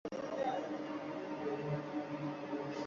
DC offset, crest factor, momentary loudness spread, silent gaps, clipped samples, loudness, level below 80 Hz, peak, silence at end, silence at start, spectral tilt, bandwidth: under 0.1%; 14 dB; 4 LU; none; under 0.1%; -41 LUFS; -76 dBFS; -26 dBFS; 0 s; 0.05 s; -5.5 dB/octave; 7.4 kHz